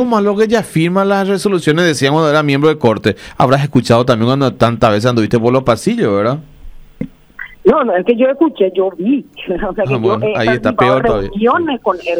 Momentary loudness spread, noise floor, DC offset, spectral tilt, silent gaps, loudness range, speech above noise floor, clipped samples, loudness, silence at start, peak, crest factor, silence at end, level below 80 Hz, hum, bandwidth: 7 LU; -33 dBFS; under 0.1%; -6.5 dB/octave; none; 3 LU; 20 dB; under 0.1%; -13 LUFS; 0 s; 0 dBFS; 12 dB; 0 s; -38 dBFS; none; 15.5 kHz